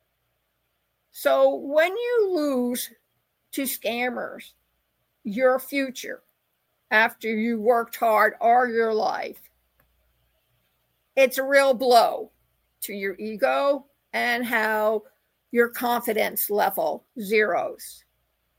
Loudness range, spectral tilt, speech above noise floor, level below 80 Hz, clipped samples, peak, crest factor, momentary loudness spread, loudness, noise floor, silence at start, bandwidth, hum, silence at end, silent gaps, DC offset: 5 LU; -3 dB/octave; 51 dB; -74 dBFS; under 0.1%; -4 dBFS; 20 dB; 15 LU; -23 LUFS; -74 dBFS; 1.15 s; 17 kHz; none; 0.65 s; none; under 0.1%